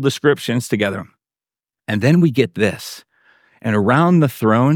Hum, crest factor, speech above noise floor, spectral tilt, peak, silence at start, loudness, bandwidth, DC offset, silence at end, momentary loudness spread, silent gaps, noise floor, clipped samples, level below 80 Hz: none; 16 dB; over 74 dB; -6.5 dB/octave; -2 dBFS; 0 s; -17 LUFS; 17.5 kHz; under 0.1%; 0 s; 16 LU; none; under -90 dBFS; under 0.1%; -60 dBFS